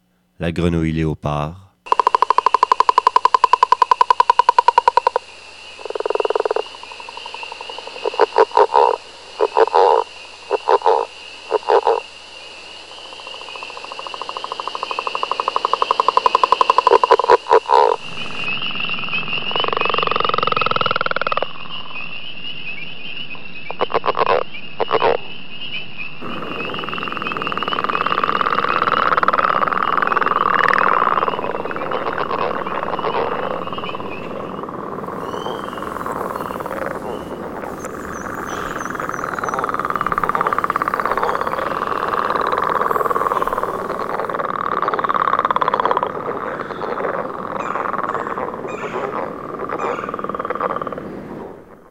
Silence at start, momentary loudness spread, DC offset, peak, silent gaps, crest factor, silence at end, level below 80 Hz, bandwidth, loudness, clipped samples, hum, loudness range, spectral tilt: 0 s; 15 LU; under 0.1%; 0 dBFS; none; 20 dB; 0 s; -48 dBFS; 16.5 kHz; -19 LUFS; under 0.1%; none; 10 LU; -4.5 dB/octave